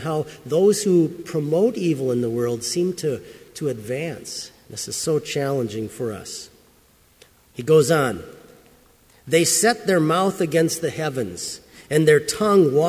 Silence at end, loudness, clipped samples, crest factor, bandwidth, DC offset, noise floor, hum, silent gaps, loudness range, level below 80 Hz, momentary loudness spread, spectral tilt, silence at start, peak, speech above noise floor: 0 s; -21 LUFS; under 0.1%; 18 dB; 16 kHz; under 0.1%; -56 dBFS; none; none; 7 LU; -56 dBFS; 15 LU; -4.5 dB/octave; 0 s; -4 dBFS; 35 dB